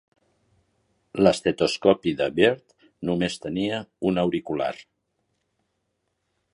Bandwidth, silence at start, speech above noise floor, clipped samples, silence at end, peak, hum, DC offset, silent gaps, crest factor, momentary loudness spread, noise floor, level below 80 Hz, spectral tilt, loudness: 11.5 kHz; 1.15 s; 53 dB; under 0.1%; 1.7 s; -4 dBFS; none; under 0.1%; none; 22 dB; 11 LU; -76 dBFS; -56 dBFS; -5.5 dB/octave; -24 LUFS